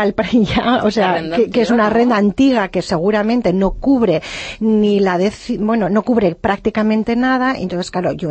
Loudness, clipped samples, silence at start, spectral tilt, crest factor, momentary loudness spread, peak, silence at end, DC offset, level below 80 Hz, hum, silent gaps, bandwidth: -15 LUFS; under 0.1%; 0 s; -6.5 dB/octave; 12 dB; 6 LU; -2 dBFS; 0 s; under 0.1%; -38 dBFS; none; none; 8.6 kHz